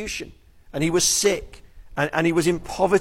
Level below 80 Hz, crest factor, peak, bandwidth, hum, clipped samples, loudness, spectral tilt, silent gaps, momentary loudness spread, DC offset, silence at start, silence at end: -44 dBFS; 16 dB; -6 dBFS; 16.5 kHz; none; under 0.1%; -22 LUFS; -3.5 dB/octave; none; 16 LU; under 0.1%; 0 s; 0 s